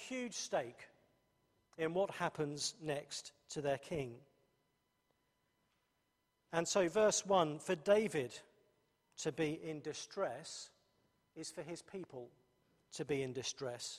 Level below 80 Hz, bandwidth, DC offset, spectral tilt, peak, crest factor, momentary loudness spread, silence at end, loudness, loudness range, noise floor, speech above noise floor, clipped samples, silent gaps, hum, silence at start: -76 dBFS; 14 kHz; under 0.1%; -3.5 dB/octave; -18 dBFS; 22 dB; 17 LU; 0 s; -39 LUFS; 11 LU; -83 dBFS; 43 dB; under 0.1%; none; none; 0 s